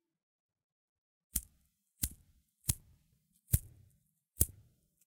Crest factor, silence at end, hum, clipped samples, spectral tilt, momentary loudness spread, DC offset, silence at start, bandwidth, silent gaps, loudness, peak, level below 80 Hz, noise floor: 36 dB; 0.6 s; none; under 0.1%; -3.5 dB/octave; 6 LU; under 0.1%; 1.35 s; 17.5 kHz; none; -37 LUFS; -8 dBFS; -50 dBFS; -75 dBFS